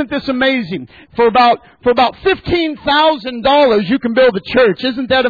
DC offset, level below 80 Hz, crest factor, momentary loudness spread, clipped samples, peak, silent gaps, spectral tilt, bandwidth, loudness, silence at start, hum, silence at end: under 0.1%; -42 dBFS; 12 dB; 8 LU; under 0.1%; -2 dBFS; none; -6.5 dB/octave; 4.9 kHz; -13 LUFS; 0 s; none; 0 s